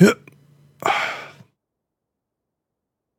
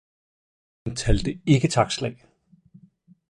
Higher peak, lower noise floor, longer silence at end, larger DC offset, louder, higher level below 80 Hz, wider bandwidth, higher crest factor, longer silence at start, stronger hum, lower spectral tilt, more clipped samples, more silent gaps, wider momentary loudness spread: first, 0 dBFS vs -6 dBFS; first, -81 dBFS vs -56 dBFS; first, 1.9 s vs 1.15 s; neither; about the same, -22 LUFS vs -24 LUFS; second, -72 dBFS vs -36 dBFS; first, 17 kHz vs 11 kHz; about the same, 24 dB vs 20 dB; second, 0 s vs 0.85 s; neither; about the same, -6 dB/octave vs -5.5 dB/octave; neither; neither; first, 16 LU vs 13 LU